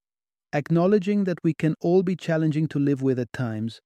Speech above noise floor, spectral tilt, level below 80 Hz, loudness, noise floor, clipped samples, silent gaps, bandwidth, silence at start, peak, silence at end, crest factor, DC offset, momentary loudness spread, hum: over 67 dB; -8.5 dB/octave; -64 dBFS; -24 LUFS; under -90 dBFS; under 0.1%; none; 9.4 kHz; 0.55 s; -8 dBFS; 0.1 s; 16 dB; under 0.1%; 8 LU; none